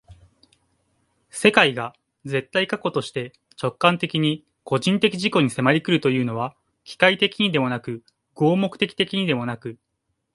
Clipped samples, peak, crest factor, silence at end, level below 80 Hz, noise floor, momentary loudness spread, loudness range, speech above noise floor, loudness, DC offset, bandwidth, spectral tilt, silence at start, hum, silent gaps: under 0.1%; 0 dBFS; 22 dB; 0.6 s; -62 dBFS; -76 dBFS; 16 LU; 3 LU; 54 dB; -21 LUFS; under 0.1%; 11.5 kHz; -5.5 dB/octave; 0.1 s; none; none